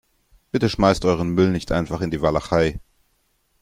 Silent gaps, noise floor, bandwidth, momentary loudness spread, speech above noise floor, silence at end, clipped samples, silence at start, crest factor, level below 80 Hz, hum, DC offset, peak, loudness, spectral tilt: none; -66 dBFS; 15.5 kHz; 7 LU; 47 dB; 0.85 s; under 0.1%; 0.55 s; 20 dB; -40 dBFS; none; under 0.1%; -2 dBFS; -21 LUFS; -6.5 dB/octave